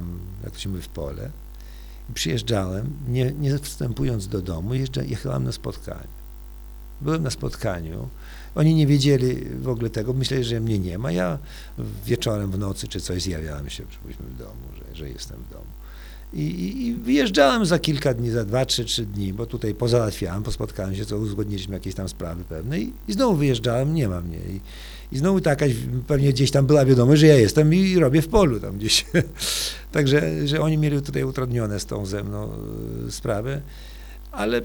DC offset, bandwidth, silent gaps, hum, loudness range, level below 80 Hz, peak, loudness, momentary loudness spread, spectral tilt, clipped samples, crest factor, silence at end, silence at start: under 0.1%; 19.5 kHz; none; none; 11 LU; -38 dBFS; -2 dBFS; -23 LUFS; 20 LU; -6 dB/octave; under 0.1%; 20 dB; 0 s; 0 s